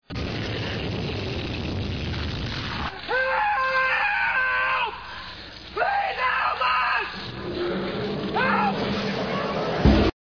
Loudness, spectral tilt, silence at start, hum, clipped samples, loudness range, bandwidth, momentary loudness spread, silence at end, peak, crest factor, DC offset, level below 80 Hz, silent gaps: -24 LUFS; -6 dB/octave; 0.1 s; none; under 0.1%; 3 LU; 5.4 kHz; 9 LU; 0.15 s; -6 dBFS; 18 dB; under 0.1%; -36 dBFS; none